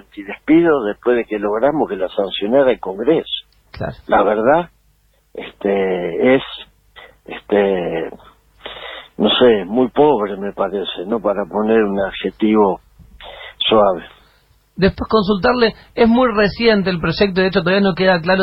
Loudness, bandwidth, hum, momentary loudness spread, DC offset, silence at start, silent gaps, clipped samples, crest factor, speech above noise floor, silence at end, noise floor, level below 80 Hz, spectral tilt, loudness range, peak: -16 LUFS; 5.8 kHz; none; 17 LU; under 0.1%; 0.15 s; none; under 0.1%; 14 dB; 41 dB; 0 s; -57 dBFS; -42 dBFS; -8 dB/octave; 4 LU; -2 dBFS